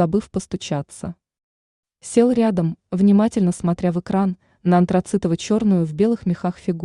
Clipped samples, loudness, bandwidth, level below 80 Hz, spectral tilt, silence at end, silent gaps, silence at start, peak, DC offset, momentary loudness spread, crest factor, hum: under 0.1%; -20 LUFS; 11 kHz; -52 dBFS; -7.5 dB/octave; 0 s; 1.43-1.83 s; 0 s; -4 dBFS; under 0.1%; 10 LU; 16 dB; none